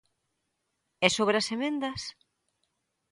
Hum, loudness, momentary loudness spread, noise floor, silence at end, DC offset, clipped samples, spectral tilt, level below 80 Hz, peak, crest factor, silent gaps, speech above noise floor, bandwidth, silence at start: none; -27 LUFS; 13 LU; -80 dBFS; 1 s; under 0.1%; under 0.1%; -3 dB/octave; -66 dBFS; -4 dBFS; 28 dB; none; 52 dB; 11.5 kHz; 1 s